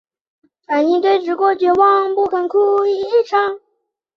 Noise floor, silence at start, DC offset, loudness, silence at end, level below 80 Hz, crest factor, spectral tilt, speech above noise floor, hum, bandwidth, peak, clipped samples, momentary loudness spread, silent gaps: -70 dBFS; 0.7 s; under 0.1%; -15 LUFS; 0.6 s; -62 dBFS; 14 dB; -5 dB/octave; 55 dB; none; 6.6 kHz; -2 dBFS; under 0.1%; 5 LU; none